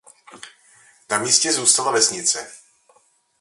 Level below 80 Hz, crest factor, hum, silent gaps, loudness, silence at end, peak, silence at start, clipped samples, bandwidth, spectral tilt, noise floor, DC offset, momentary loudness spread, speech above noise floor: -70 dBFS; 22 dB; none; none; -17 LUFS; 0.85 s; 0 dBFS; 0.35 s; under 0.1%; 12 kHz; 0 dB/octave; -60 dBFS; under 0.1%; 10 LU; 40 dB